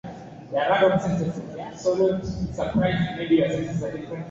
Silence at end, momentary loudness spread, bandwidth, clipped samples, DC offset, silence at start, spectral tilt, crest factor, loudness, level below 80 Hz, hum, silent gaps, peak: 0 s; 14 LU; 7.8 kHz; under 0.1%; under 0.1%; 0.05 s; -7 dB/octave; 16 dB; -24 LUFS; -46 dBFS; none; none; -8 dBFS